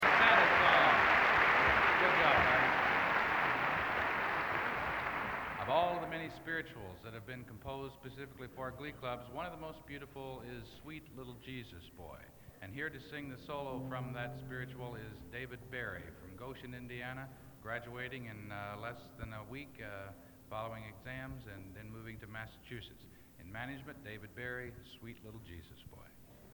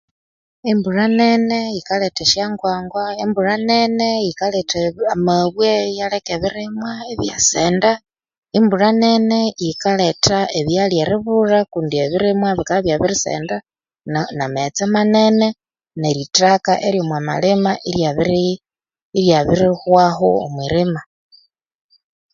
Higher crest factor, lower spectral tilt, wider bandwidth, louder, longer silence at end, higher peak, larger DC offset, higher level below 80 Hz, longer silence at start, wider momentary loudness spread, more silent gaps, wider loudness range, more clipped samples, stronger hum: first, 22 dB vs 16 dB; about the same, -5 dB/octave vs -4.5 dB/octave; first, 19.5 kHz vs 7.6 kHz; second, -33 LUFS vs -17 LUFS; second, 0 s vs 1.3 s; second, -14 dBFS vs 0 dBFS; neither; second, -60 dBFS vs -48 dBFS; second, 0 s vs 0.65 s; first, 23 LU vs 9 LU; second, none vs 8.38-8.42 s, 19.02-19.12 s; first, 19 LU vs 2 LU; neither; neither